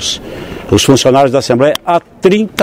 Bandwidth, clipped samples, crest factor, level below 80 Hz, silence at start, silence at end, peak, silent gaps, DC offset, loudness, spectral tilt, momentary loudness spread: 16.5 kHz; 0.3%; 10 dB; -38 dBFS; 0 s; 0 s; 0 dBFS; none; under 0.1%; -10 LUFS; -4.5 dB/octave; 12 LU